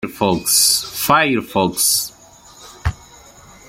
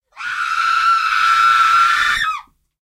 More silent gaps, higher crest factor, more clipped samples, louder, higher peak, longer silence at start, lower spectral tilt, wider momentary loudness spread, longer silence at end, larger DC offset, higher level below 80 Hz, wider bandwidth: neither; about the same, 18 dB vs 14 dB; neither; about the same, -15 LUFS vs -14 LUFS; about the same, 0 dBFS vs -2 dBFS; second, 0 s vs 0.15 s; first, -2.5 dB/octave vs 1.5 dB/octave; first, 14 LU vs 10 LU; first, 0.75 s vs 0.4 s; neither; first, -40 dBFS vs -50 dBFS; about the same, 16.5 kHz vs 15.5 kHz